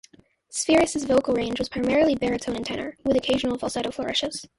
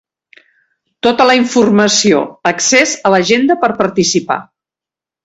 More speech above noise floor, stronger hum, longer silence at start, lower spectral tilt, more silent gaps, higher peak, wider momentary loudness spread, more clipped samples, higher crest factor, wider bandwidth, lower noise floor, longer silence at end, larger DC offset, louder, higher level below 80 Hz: second, 31 dB vs 76 dB; neither; second, 0.5 s vs 1.05 s; about the same, -3.5 dB/octave vs -3 dB/octave; neither; second, -6 dBFS vs 0 dBFS; about the same, 8 LU vs 7 LU; neither; first, 18 dB vs 12 dB; first, 11.5 kHz vs 8.2 kHz; second, -55 dBFS vs -88 dBFS; second, 0.1 s vs 0.8 s; neither; second, -24 LUFS vs -11 LUFS; about the same, -50 dBFS vs -54 dBFS